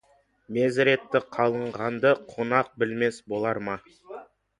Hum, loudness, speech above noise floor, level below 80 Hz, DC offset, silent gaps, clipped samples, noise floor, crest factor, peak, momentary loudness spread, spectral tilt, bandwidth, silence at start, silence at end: none; -26 LUFS; 19 dB; -66 dBFS; under 0.1%; none; under 0.1%; -44 dBFS; 22 dB; -4 dBFS; 16 LU; -6 dB/octave; 11 kHz; 0.5 s; 0.35 s